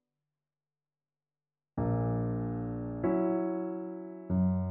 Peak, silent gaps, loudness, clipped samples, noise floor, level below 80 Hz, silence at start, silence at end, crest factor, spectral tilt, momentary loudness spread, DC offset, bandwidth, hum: -20 dBFS; none; -33 LUFS; under 0.1%; under -90 dBFS; -54 dBFS; 1.75 s; 0 s; 14 dB; -12.5 dB/octave; 10 LU; under 0.1%; 2.8 kHz; none